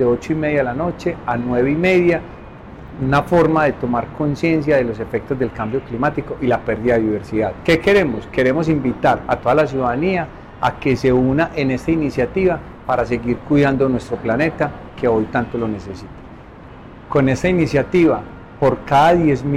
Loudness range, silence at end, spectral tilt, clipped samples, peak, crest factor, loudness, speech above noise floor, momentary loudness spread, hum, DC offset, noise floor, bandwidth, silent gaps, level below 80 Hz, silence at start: 3 LU; 0 s; -7.5 dB/octave; under 0.1%; -6 dBFS; 12 dB; -18 LUFS; 21 dB; 9 LU; none; under 0.1%; -38 dBFS; 13 kHz; none; -38 dBFS; 0 s